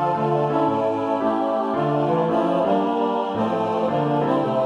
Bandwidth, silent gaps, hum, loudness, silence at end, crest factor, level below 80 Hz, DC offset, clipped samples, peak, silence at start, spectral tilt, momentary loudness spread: 10 kHz; none; none; -21 LUFS; 0 s; 12 dB; -60 dBFS; under 0.1%; under 0.1%; -8 dBFS; 0 s; -8.5 dB/octave; 2 LU